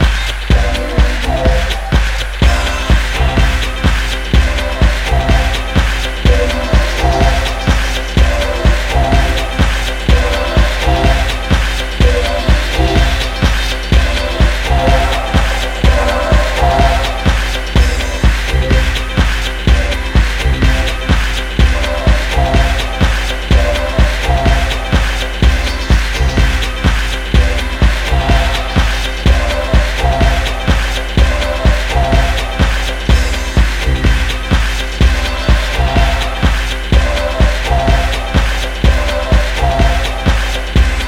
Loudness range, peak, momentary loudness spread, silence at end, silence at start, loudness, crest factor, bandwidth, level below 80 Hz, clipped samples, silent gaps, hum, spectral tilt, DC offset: 1 LU; 0 dBFS; 3 LU; 0 s; 0 s; -14 LUFS; 12 dB; 15 kHz; -14 dBFS; under 0.1%; none; none; -5 dB/octave; under 0.1%